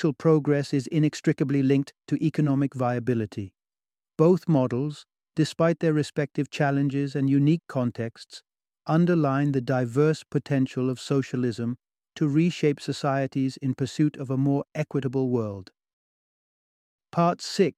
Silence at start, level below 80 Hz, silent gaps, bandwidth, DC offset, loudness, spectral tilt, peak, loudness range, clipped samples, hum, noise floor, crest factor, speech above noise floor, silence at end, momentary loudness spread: 0 s; -66 dBFS; 15.93-16.99 s; 11.5 kHz; under 0.1%; -25 LUFS; -7.5 dB/octave; -6 dBFS; 3 LU; under 0.1%; none; under -90 dBFS; 18 dB; over 66 dB; 0.05 s; 10 LU